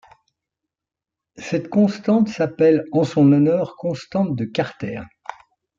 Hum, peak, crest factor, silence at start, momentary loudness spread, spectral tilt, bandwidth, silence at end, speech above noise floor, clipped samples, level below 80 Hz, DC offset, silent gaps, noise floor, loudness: none; -4 dBFS; 16 dB; 1.4 s; 17 LU; -8 dB/octave; 7.6 kHz; 0.45 s; 69 dB; under 0.1%; -60 dBFS; under 0.1%; none; -87 dBFS; -19 LUFS